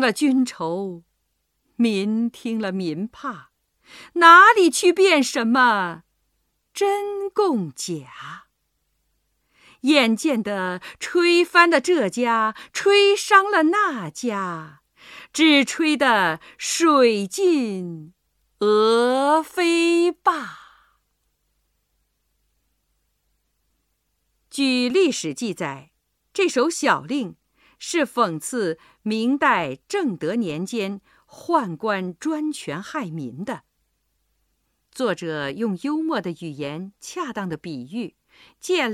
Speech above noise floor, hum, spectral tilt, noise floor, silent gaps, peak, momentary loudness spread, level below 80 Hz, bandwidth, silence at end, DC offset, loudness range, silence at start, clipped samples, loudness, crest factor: 52 dB; none; -3.5 dB/octave; -73 dBFS; none; 0 dBFS; 16 LU; -68 dBFS; 15 kHz; 0 s; under 0.1%; 12 LU; 0 s; under 0.1%; -20 LUFS; 22 dB